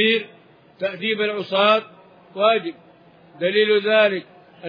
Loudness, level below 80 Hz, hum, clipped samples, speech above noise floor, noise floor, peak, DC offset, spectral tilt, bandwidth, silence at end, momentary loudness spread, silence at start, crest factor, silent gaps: -20 LUFS; -78 dBFS; none; under 0.1%; 31 dB; -50 dBFS; -4 dBFS; under 0.1%; -6 dB/octave; 5.2 kHz; 0 s; 13 LU; 0 s; 18 dB; none